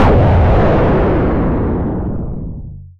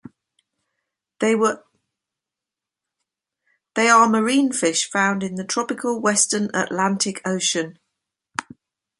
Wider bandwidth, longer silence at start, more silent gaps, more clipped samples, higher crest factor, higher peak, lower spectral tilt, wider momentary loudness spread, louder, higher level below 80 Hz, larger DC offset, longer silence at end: second, 6 kHz vs 11.5 kHz; second, 0 s vs 1.2 s; neither; neither; second, 10 dB vs 22 dB; second, -4 dBFS vs 0 dBFS; first, -10 dB/octave vs -3 dB/octave; about the same, 15 LU vs 16 LU; first, -14 LUFS vs -20 LUFS; first, -18 dBFS vs -68 dBFS; neither; second, 0.1 s vs 0.55 s